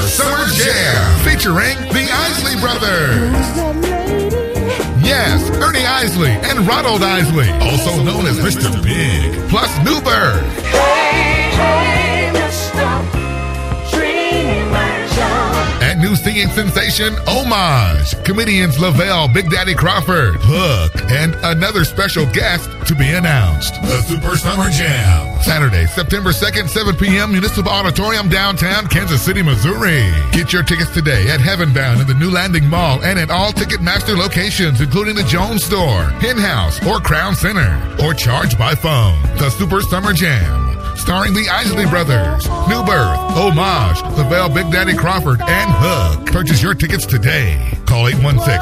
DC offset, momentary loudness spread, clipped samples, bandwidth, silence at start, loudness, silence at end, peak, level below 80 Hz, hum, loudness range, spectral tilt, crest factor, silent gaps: under 0.1%; 4 LU; under 0.1%; 16 kHz; 0 s; -14 LUFS; 0 s; 0 dBFS; -22 dBFS; none; 2 LU; -5 dB/octave; 12 dB; none